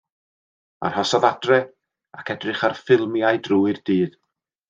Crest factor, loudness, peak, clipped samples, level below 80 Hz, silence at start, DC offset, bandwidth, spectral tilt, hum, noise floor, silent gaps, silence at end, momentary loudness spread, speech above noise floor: 20 dB; -21 LUFS; -2 dBFS; under 0.1%; -68 dBFS; 0.8 s; under 0.1%; 7.8 kHz; -5.5 dB/octave; none; under -90 dBFS; none; 0.6 s; 10 LU; over 70 dB